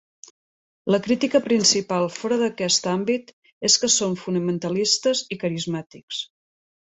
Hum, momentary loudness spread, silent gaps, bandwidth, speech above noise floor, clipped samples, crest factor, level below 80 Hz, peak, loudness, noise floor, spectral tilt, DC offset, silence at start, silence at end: none; 13 LU; 3.33-3.42 s, 3.53-3.61 s, 6.03-6.08 s; 8.4 kHz; over 68 dB; under 0.1%; 20 dB; -64 dBFS; -4 dBFS; -22 LUFS; under -90 dBFS; -3 dB/octave; under 0.1%; 0.85 s; 0.7 s